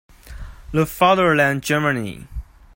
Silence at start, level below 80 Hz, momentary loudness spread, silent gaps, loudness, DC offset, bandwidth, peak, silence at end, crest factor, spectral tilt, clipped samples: 0.25 s; -38 dBFS; 24 LU; none; -18 LUFS; under 0.1%; 16.5 kHz; -2 dBFS; 0.35 s; 18 dB; -5.5 dB/octave; under 0.1%